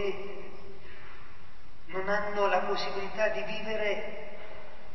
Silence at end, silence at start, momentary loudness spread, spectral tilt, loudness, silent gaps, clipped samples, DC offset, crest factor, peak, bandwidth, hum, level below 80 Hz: 0 s; 0 s; 22 LU; -4.5 dB/octave; -32 LUFS; none; under 0.1%; 3%; 20 dB; -16 dBFS; 6.2 kHz; none; -58 dBFS